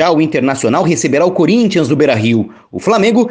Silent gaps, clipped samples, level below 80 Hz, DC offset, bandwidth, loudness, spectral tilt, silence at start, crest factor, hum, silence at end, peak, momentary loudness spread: none; under 0.1%; -52 dBFS; under 0.1%; 10 kHz; -12 LUFS; -5.5 dB/octave; 0 s; 12 dB; none; 0 s; 0 dBFS; 4 LU